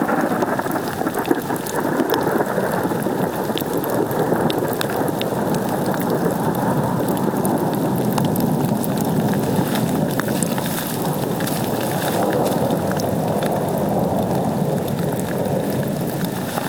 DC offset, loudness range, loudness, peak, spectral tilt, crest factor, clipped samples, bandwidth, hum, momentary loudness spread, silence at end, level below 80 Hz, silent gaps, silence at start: 0.1%; 1 LU; -20 LUFS; 0 dBFS; -6 dB/octave; 20 dB; under 0.1%; 20 kHz; none; 3 LU; 0 s; -50 dBFS; none; 0 s